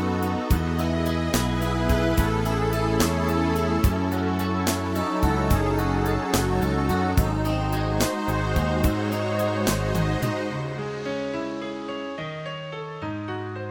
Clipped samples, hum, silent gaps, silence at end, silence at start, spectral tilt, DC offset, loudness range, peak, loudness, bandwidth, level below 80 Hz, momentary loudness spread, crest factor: under 0.1%; none; none; 0 s; 0 s; -6 dB/octave; under 0.1%; 5 LU; -6 dBFS; -25 LUFS; 19 kHz; -32 dBFS; 9 LU; 18 dB